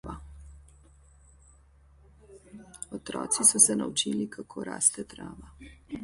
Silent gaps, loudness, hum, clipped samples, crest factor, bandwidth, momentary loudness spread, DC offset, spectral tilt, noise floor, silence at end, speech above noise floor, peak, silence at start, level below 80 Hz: none; -24 LUFS; none; under 0.1%; 26 dB; 12 kHz; 24 LU; under 0.1%; -2 dB/octave; -58 dBFS; 0 s; 29 dB; -6 dBFS; 0.05 s; -54 dBFS